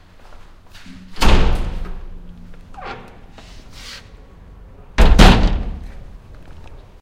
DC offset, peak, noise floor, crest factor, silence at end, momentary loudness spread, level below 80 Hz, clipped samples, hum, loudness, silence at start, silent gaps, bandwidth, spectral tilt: under 0.1%; 0 dBFS; -41 dBFS; 18 dB; 0.25 s; 29 LU; -20 dBFS; under 0.1%; none; -16 LUFS; 0.9 s; none; 14 kHz; -5.5 dB/octave